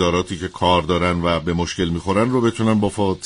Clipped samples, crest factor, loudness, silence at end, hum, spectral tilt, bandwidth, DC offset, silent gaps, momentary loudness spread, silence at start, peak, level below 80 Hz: under 0.1%; 16 dB; -19 LUFS; 0 s; none; -6 dB/octave; 11 kHz; under 0.1%; none; 5 LU; 0 s; -2 dBFS; -40 dBFS